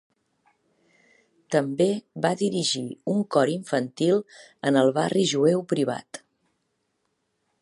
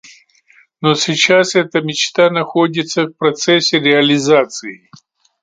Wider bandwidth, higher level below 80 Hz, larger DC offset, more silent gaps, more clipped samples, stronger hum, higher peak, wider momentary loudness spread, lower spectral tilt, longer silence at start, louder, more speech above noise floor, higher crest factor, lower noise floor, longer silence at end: first, 11.5 kHz vs 9.4 kHz; second, -74 dBFS vs -62 dBFS; neither; neither; neither; neither; second, -6 dBFS vs 0 dBFS; about the same, 8 LU vs 8 LU; first, -5 dB/octave vs -3.5 dB/octave; first, 1.5 s vs 0.8 s; second, -24 LUFS vs -13 LUFS; first, 51 dB vs 37 dB; first, 20 dB vs 14 dB; first, -75 dBFS vs -51 dBFS; first, 1.45 s vs 0.7 s